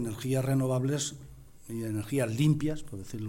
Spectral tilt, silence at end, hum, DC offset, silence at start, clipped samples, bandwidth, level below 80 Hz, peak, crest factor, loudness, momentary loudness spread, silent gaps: -6 dB/octave; 0 s; none; under 0.1%; 0 s; under 0.1%; 16 kHz; -52 dBFS; -14 dBFS; 16 dB; -30 LUFS; 14 LU; none